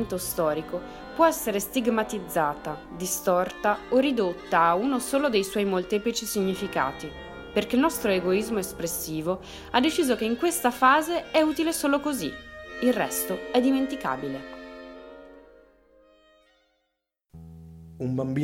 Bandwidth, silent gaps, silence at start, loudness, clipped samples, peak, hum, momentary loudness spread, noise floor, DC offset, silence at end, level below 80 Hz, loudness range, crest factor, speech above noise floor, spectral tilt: 17 kHz; none; 0 s; -26 LUFS; under 0.1%; -6 dBFS; none; 15 LU; -79 dBFS; under 0.1%; 0 s; -54 dBFS; 6 LU; 20 dB; 54 dB; -4 dB/octave